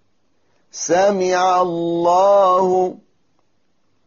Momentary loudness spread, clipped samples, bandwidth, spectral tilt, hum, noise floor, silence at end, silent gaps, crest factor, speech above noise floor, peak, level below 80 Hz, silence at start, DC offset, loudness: 9 LU; under 0.1%; 7.2 kHz; -4 dB/octave; none; -68 dBFS; 1.1 s; none; 12 dB; 52 dB; -4 dBFS; -62 dBFS; 0.75 s; under 0.1%; -16 LUFS